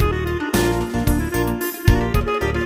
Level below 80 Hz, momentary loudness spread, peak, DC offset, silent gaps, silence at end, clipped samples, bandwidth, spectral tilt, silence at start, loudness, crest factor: -26 dBFS; 3 LU; -2 dBFS; under 0.1%; none; 0 s; under 0.1%; 16.5 kHz; -6 dB/octave; 0 s; -20 LUFS; 16 dB